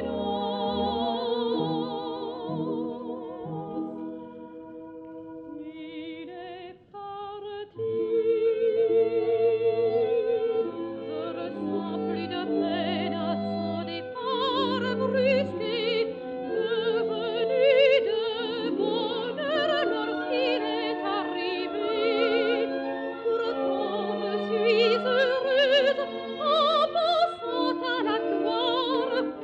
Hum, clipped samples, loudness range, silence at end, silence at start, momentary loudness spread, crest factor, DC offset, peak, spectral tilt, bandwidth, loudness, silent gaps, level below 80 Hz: none; under 0.1%; 11 LU; 0 s; 0 s; 15 LU; 16 dB; under 0.1%; -10 dBFS; -6.5 dB/octave; 7.6 kHz; -26 LUFS; none; -64 dBFS